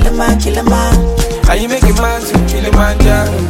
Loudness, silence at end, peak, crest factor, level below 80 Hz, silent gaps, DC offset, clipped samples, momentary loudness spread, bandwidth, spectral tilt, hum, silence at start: -12 LUFS; 0 s; 0 dBFS; 10 dB; -12 dBFS; none; under 0.1%; under 0.1%; 3 LU; 17 kHz; -5.5 dB/octave; none; 0 s